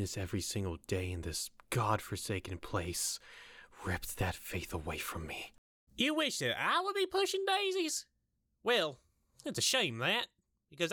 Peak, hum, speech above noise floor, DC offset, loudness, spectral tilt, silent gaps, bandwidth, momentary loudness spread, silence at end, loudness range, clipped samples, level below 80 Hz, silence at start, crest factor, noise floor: -18 dBFS; none; 45 dB; under 0.1%; -35 LUFS; -3 dB/octave; 5.58-5.87 s; over 20 kHz; 12 LU; 0 s; 5 LU; under 0.1%; -58 dBFS; 0 s; 20 dB; -81 dBFS